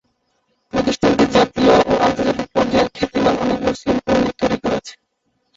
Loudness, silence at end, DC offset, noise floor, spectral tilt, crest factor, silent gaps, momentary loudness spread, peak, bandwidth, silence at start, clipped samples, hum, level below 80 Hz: -17 LUFS; 0.65 s; under 0.1%; -68 dBFS; -5.5 dB/octave; 16 dB; none; 8 LU; -2 dBFS; 8 kHz; 0.75 s; under 0.1%; none; -42 dBFS